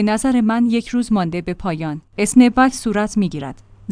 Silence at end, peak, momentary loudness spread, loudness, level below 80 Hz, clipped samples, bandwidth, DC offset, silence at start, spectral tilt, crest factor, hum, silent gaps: 0 s; 0 dBFS; 13 LU; -17 LUFS; -42 dBFS; under 0.1%; 10.5 kHz; under 0.1%; 0 s; -5.5 dB/octave; 16 dB; none; none